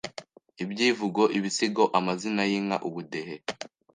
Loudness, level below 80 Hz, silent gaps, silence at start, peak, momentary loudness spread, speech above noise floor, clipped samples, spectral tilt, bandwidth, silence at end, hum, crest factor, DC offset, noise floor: -27 LUFS; -74 dBFS; none; 0.05 s; -8 dBFS; 13 LU; 20 dB; under 0.1%; -4 dB/octave; 10 kHz; 0.3 s; none; 20 dB; under 0.1%; -47 dBFS